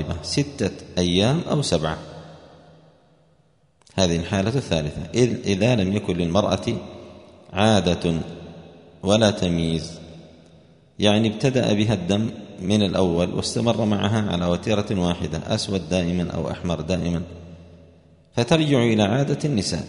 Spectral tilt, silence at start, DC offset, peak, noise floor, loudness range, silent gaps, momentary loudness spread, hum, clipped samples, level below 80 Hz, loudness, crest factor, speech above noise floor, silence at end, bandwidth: -5.5 dB/octave; 0 s; under 0.1%; -2 dBFS; -61 dBFS; 4 LU; none; 12 LU; none; under 0.1%; -46 dBFS; -22 LUFS; 20 dB; 39 dB; 0 s; 10.5 kHz